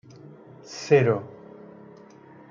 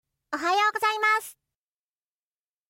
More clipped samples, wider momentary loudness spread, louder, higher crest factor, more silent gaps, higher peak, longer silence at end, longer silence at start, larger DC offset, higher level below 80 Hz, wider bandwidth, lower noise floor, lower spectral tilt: neither; first, 27 LU vs 12 LU; about the same, -22 LUFS vs -24 LUFS; about the same, 22 dB vs 18 dB; neither; first, -6 dBFS vs -12 dBFS; second, 1.25 s vs 1.4 s; first, 0.7 s vs 0.3 s; neither; first, -72 dBFS vs -78 dBFS; second, 7.4 kHz vs 16.5 kHz; second, -49 dBFS vs under -90 dBFS; first, -6.5 dB/octave vs 0 dB/octave